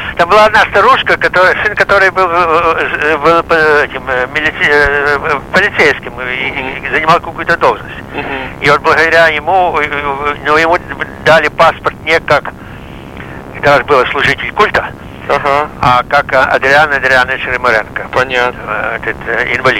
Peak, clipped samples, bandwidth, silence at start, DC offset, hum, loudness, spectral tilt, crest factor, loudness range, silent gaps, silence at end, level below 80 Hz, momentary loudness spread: 0 dBFS; under 0.1%; 16.5 kHz; 0 s; under 0.1%; none; -10 LUFS; -4.5 dB/octave; 10 dB; 3 LU; none; 0 s; -34 dBFS; 10 LU